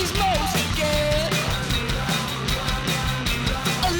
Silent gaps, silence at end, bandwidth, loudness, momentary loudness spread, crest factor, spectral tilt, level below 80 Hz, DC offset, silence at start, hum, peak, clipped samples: none; 0 s; over 20 kHz; -23 LUFS; 3 LU; 14 dB; -4 dB/octave; -32 dBFS; under 0.1%; 0 s; none; -8 dBFS; under 0.1%